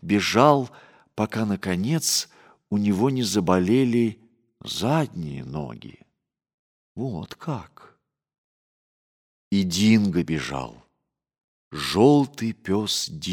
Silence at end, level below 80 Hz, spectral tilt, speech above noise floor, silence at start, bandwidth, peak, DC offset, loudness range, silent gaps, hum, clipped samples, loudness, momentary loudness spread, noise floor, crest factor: 0 s; -56 dBFS; -5 dB/octave; 56 dB; 0.05 s; 17.5 kHz; -2 dBFS; under 0.1%; 13 LU; 6.54-6.95 s, 8.38-9.51 s, 11.44-11.71 s; none; under 0.1%; -23 LUFS; 16 LU; -78 dBFS; 22 dB